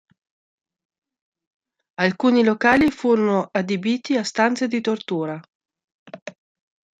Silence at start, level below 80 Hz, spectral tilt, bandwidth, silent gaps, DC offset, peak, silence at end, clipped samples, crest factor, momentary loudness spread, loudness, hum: 2 s; -56 dBFS; -5.5 dB/octave; 9.2 kHz; 5.55-5.60 s, 5.84-6.06 s, 6.22-6.26 s; under 0.1%; -2 dBFS; 0.7 s; under 0.1%; 20 dB; 22 LU; -20 LUFS; none